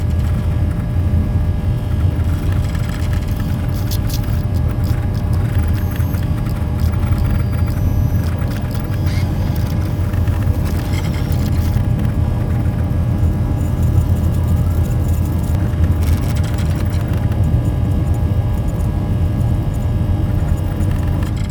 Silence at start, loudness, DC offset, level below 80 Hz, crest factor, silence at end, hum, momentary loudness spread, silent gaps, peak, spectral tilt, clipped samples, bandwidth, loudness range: 0 s; -18 LUFS; under 0.1%; -22 dBFS; 14 dB; 0 s; none; 3 LU; none; -2 dBFS; -7.5 dB/octave; under 0.1%; 19.5 kHz; 2 LU